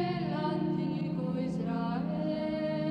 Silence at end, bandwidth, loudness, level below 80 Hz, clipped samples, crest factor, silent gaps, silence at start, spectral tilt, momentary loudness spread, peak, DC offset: 0 s; 6.8 kHz; -33 LUFS; -60 dBFS; under 0.1%; 12 dB; none; 0 s; -9 dB/octave; 1 LU; -20 dBFS; under 0.1%